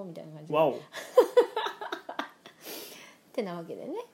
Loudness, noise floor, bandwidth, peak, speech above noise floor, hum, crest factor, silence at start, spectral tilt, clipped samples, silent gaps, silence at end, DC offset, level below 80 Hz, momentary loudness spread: -29 LUFS; -50 dBFS; 16.5 kHz; -8 dBFS; 21 dB; none; 22 dB; 0 s; -4.5 dB/octave; under 0.1%; none; 0.05 s; under 0.1%; -86 dBFS; 20 LU